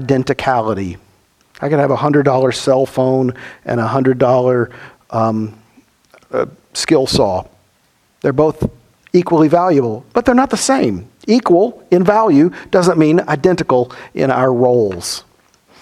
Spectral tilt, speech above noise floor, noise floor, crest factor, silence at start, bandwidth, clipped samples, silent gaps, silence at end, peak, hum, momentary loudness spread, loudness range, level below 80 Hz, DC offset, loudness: -6 dB/octave; 44 dB; -57 dBFS; 14 dB; 0 s; 14.5 kHz; under 0.1%; none; 0.6 s; 0 dBFS; none; 11 LU; 5 LU; -46 dBFS; under 0.1%; -14 LUFS